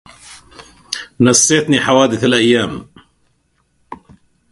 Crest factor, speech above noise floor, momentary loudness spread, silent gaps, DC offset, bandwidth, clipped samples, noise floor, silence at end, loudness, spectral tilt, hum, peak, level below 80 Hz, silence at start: 16 dB; 49 dB; 15 LU; none; under 0.1%; 11.5 kHz; under 0.1%; -61 dBFS; 0.55 s; -13 LUFS; -3.5 dB/octave; none; 0 dBFS; -50 dBFS; 0.3 s